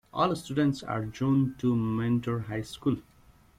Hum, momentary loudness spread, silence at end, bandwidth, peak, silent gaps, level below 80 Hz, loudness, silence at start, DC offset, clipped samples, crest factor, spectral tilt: none; 7 LU; 0.55 s; 15 kHz; -10 dBFS; none; -56 dBFS; -29 LUFS; 0.15 s; under 0.1%; under 0.1%; 18 dB; -7.5 dB/octave